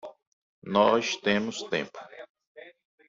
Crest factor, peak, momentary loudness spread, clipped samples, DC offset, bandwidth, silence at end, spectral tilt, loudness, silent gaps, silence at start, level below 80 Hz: 22 dB; -8 dBFS; 25 LU; under 0.1%; under 0.1%; 7.8 kHz; 0.4 s; -4 dB/octave; -26 LUFS; 0.27-0.62 s, 2.29-2.35 s, 2.47-2.55 s; 0.05 s; -70 dBFS